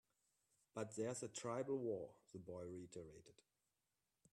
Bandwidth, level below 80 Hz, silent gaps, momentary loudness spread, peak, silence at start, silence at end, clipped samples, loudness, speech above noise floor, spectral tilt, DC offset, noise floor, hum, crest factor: 13 kHz; -84 dBFS; none; 13 LU; -34 dBFS; 0.75 s; 1 s; under 0.1%; -49 LUFS; over 41 dB; -5 dB/octave; under 0.1%; under -90 dBFS; none; 18 dB